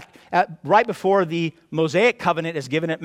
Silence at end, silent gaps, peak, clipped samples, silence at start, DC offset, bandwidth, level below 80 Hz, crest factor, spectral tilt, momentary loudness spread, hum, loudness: 0 s; none; -2 dBFS; under 0.1%; 0 s; under 0.1%; 14.5 kHz; -66 dBFS; 18 dB; -6 dB/octave; 7 LU; none; -21 LUFS